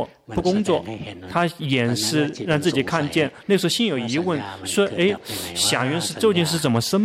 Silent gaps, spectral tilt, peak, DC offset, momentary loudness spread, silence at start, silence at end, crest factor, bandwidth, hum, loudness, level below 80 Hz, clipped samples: none; -4.5 dB/octave; -6 dBFS; under 0.1%; 7 LU; 0 s; 0 s; 16 dB; 16 kHz; none; -21 LUFS; -52 dBFS; under 0.1%